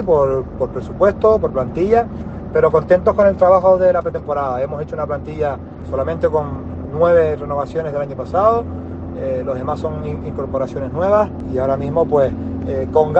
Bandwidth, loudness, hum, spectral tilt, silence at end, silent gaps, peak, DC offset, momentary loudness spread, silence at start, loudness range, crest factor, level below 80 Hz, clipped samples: 7.8 kHz; -17 LUFS; none; -9 dB/octave; 0 s; none; 0 dBFS; under 0.1%; 12 LU; 0 s; 6 LU; 16 dB; -38 dBFS; under 0.1%